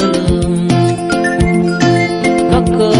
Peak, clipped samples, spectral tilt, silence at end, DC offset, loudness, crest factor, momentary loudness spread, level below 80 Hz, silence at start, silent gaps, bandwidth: 0 dBFS; under 0.1%; -6 dB/octave; 0 s; under 0.1%; -12 LUFS; 12 dB; 2 LU; -28 dBFS; 0 s; none; 11 kHz